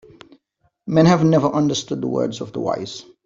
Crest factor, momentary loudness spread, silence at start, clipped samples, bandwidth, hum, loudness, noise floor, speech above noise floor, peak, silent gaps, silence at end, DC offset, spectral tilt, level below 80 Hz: 16 dB; 13 LU; 0.85 s; under 0.1%; 7.6 kHz; none; -19 LUFS; -67 dBFS; 49 dB; -2 dBFS; none; 0.25 s; under 0.1%; -6.5 dB/octave; -54 dBFS